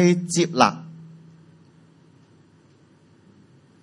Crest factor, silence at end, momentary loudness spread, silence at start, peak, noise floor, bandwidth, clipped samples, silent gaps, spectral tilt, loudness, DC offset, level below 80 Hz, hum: 26 dB; 2.75 s; 26 LU; 0 s; 0 dBFS; -55 dBFS; 11.5 kHz; under 0.1%; none; -5 dB/octave; -20 LUFS; under 0.1%; -72 dBFS; none